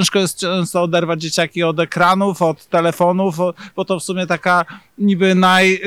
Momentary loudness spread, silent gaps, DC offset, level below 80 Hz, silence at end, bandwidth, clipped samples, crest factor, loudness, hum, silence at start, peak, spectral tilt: 8 LU; none; under 0.1%; -60 dBFS; 0 s; 15 kHz; under 0.1%; 14 dB; -16 LUFS; none; 0 s; -2 dBFS; -4.5 dB/octave